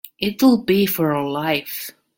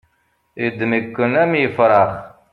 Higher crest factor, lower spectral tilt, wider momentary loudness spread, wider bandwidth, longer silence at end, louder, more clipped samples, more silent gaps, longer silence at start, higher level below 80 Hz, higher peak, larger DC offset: about the same, 16 dB vs 16 dB; second, -5.5 dB/octave vs -8.5 dB/octave; about the same, 11 LU vs 10 LU; first, 17 kHz vs 5.4 kHz; about the same, 0.25 s vs 0.25 s; about the same, -19 LUFS vs -17 LUFS; neither; neither; second, 0.2 s vs 0.55 s; about the same, -56 dBFS vs -56 dBFS; about the same, -4 dBFS vs -2 dBFS; neither